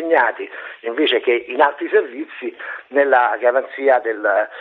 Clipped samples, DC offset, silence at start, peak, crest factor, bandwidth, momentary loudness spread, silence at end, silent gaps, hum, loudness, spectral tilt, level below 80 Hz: under 0.1%; under 0.1%; 0 s; 0 dBFS; 18 dB; 4.3 kHz; 14 LU; 0 s; none; none; -17 LUFS; -5.5 dB/octave; -72 dBFS